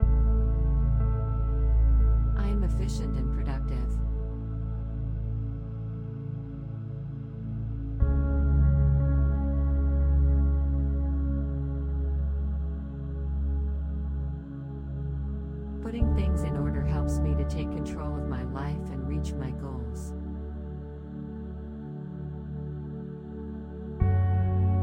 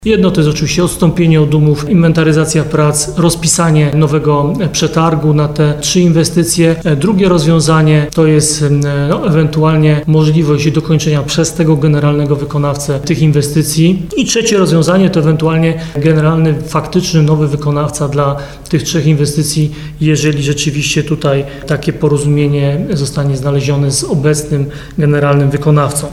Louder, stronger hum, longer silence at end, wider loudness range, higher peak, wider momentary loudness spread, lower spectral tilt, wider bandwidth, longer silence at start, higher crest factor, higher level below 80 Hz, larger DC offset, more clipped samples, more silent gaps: second, -30 LUFS vs -11 LUFS; neither; about the same, 0 s vs 0 s; first, 10 LU vs 3 LU; second, -10 dBFS vs 0 dBFS; first, 13 LU vs 5 LU; first, -9 dB/octave vs -5.5 dB/octave; second, 8.6 kHz vs 13.5 kHz; about the same, 0 s vs 0 s; first, 18 dB vs 10 dB; first, -28 dBFS vs -34 dBFS; neither; neither; neither